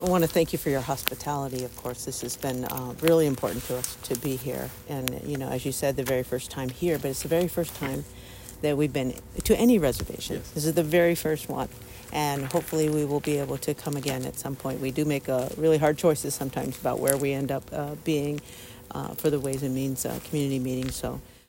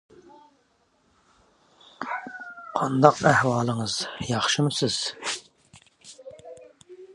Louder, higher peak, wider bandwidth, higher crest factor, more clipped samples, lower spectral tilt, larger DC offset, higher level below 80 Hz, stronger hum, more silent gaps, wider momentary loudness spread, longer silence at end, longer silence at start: second, -27 LUFS vs -24 LUFS; about the same, 0 dBFS vs 0 dBFS; first, over 20 kHz vs 11.5 kHz; about the same, 26 dB vs 26 dB; neither; about the same, -5 dB/octave vs -4.5 dB/octave; neither; first, -48 dBFS vs -60 dBFS; neither; neither; second, 11 LU vs 25 LU; first, 0.15 s vs 0 s; second, 0 s vs 2 s